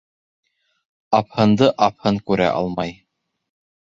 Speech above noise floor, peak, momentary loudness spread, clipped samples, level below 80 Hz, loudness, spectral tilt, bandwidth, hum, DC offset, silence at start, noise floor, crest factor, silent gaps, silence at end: 55 dB; -2 dBFS; 9 LU; under 0.1%; -52 dBFS; -19 LUFS; -7 dB/octave; 7.6 kHz; none; under 0.1%; 1.1 s; -73 dBFS; 20 dB; none; 0.9 s